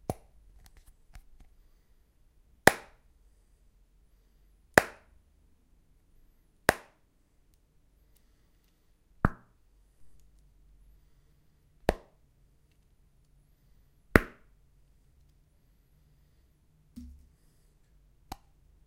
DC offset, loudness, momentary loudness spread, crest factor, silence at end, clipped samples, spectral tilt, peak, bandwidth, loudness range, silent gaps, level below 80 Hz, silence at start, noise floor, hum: under 0.1%; -29 LUFS; 26 LU; 38 dB; 1.85 s; under 0.1%; -4.5 dB/octave; 0 dBFS; 16 kHz; 12 LU; none; -48 dBFS; 0.1 s; -67 dBFS; none